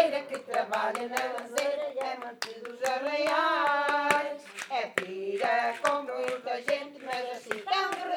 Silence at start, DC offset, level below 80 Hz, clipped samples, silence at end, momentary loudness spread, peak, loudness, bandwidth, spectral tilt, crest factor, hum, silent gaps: 0 s; under 0.1%; -86 dBFS; under 0.1%; 0 s; 10 LU; -8 dBFS; -30 LUFS; 19.5 kHz; -2 dB/octave; 22 dB; none; none